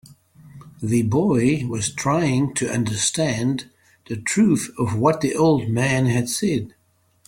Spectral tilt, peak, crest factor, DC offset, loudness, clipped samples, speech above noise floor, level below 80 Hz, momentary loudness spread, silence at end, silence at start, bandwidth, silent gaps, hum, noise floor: -5 dB/octave; -4 dBFS; 18 dB; under 0.1%; -21 LUFS; under 0.1%; 38 dB; -52 dBFS; 7 LU; 0.6 s; 0.45 s; 16.5 kHz; none; none; -58 dBFS